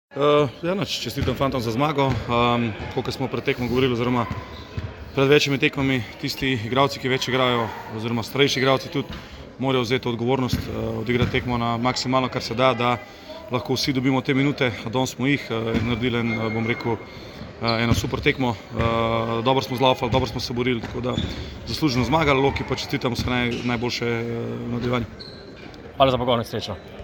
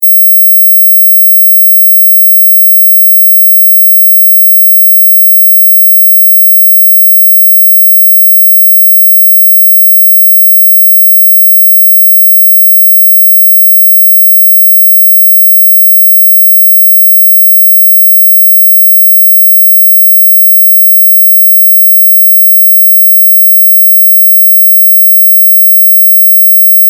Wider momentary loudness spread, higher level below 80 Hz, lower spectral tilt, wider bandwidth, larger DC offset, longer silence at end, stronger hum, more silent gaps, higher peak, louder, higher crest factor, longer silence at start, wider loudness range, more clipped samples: first, 10 LU vs 0 LU; first, -42 dBFS vs under -90 dBFS; first, -5.5 dB/octave vs 2 dB/octave; about the same, 17 kHz vs 18.5 kHz; neither; about the same, 0 s vs 0 s; neither; neither; about the same, -2 dBFS vs 0 dBFS; second, -23 LUFS vs 0 LUFS; first, 20 dB vs 4 dB; about the same, 0.1 s vs 0 s; about the same, 2 LU vs 0 LU; second, under 0.1% vs 0.4%